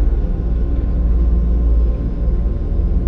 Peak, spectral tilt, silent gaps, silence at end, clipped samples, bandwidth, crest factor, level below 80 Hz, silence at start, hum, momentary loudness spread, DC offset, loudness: -4 dBFS; -11 dB/octave; none; 0 s; under 0.1%; 2.2 kHz; 10 dB; -16 dBFS; 0 s; none; 4 LU; under 0.1%; -19 LUFS